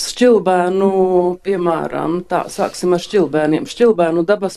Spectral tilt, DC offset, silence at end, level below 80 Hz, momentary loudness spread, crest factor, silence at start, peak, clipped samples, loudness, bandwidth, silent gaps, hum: -5.5 dB/octave; under 0.1%; 0 s; -54 dBFS; 7 LU; 14 dB; 0 s; -2 dBFS; under 0.1%; -16 LUFS; 13 kHz; none; none